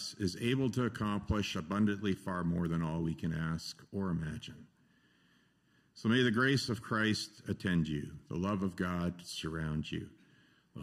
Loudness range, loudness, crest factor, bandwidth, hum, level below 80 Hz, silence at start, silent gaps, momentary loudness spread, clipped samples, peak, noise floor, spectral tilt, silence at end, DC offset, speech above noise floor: 5 LU; -35 LUFS; 18 dB; 14.5 kHz; none; -56 dBFS; 0 s; none; 11 LU; under 0.1%; -16 dBFS; -71 dBFS; -5.5 dB/octave; 0 s; under 0.1%; 36 dB